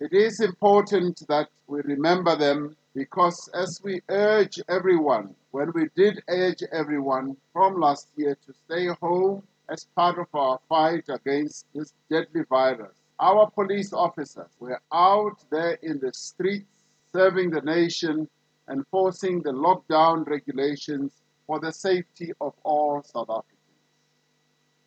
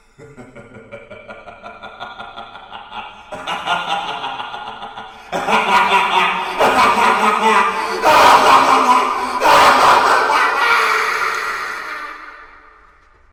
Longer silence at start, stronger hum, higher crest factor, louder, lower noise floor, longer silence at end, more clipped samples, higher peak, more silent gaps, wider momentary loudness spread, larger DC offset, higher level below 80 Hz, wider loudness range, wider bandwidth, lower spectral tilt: second, 0 s vs 0.2 s; neither; about the same, 18 dB vs 16 dB; second, -24 LUFS vs -13 LUFS; first, -69 dBFS vs -49 dBFS; first, 1.45 s vs 0.85 s; neither; second, -6 dBFS vs 0 dBFS; neither; second, 13 LU vs 23 LU; neither; second, -84 dBFS vs -50 dBFS; second, 3 LU vs 15 LU; second, 8.8 kHz vs over 20 kHz; first, -5.5 dB/octave vs -2 dB/octave